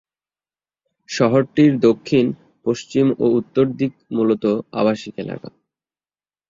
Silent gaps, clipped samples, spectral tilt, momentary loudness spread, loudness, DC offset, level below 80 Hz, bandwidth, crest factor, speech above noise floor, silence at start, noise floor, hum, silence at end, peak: none; under 0.1%; -7 dB/octave; 13 LU; -18 LUFS; under 0.1%; -60 dBFS; 7.6 kHz; 18 dB; over 72 dB; 1.1 s; under -90 dBFS; none; 1 s; -2 dBFS